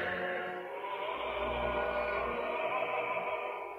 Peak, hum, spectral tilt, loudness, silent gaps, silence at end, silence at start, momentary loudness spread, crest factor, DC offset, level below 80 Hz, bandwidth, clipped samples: -22 dBFS; none; -6 dB/octave; -35 LUFS; none; 0 s; 0 s; 5 LU; 14 dB; under 0.1%; -54 dBFS; 15 kHz; under 0.1%